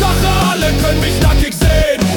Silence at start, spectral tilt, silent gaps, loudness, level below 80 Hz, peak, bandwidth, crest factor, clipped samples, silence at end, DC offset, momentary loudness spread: 0 s; -5 dB/octave; none; -13 LUFS; -16 dBFS; -2 dBFS; 19 kHz; 10 dB; under 0.1%; 0 s; under 0.1%; 1 LU